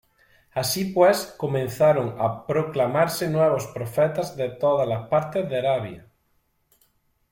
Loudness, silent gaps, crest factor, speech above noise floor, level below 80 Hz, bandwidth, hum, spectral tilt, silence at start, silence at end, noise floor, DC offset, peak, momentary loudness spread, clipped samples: -23 LUFS; none; 18 dB; 46 dB; -60 dBFS; 16.5 kHz; none; -5.5 dB/octave; 0.55 s; 1.35 s; -68 dBFS; under 0.1%; -6 dBFS; 8 LU; under 0.1%